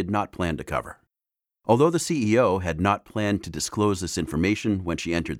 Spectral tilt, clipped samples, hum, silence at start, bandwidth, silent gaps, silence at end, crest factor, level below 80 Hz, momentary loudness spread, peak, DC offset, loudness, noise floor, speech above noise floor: -5.5 dB/octave; under 0.1%; none; 0 s; 16.5 kHz; none; 0 s; 20 dB; -48 dBFS; 9 LU; -4 dBFS; under 0.1%; -24 LUFS; -87 dBFS; 63 dB